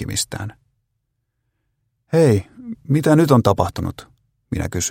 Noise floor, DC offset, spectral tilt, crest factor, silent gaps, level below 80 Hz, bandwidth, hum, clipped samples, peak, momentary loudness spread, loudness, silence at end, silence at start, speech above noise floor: -73 dBFS; under 0.1%; -6 dB/octave; 20 dB; none; -44 dBFS; 17 kHz; none; under 0.1%; 0 dBFS; 17 LU; -18 LUFS; 0 s; 0 s; 56 dB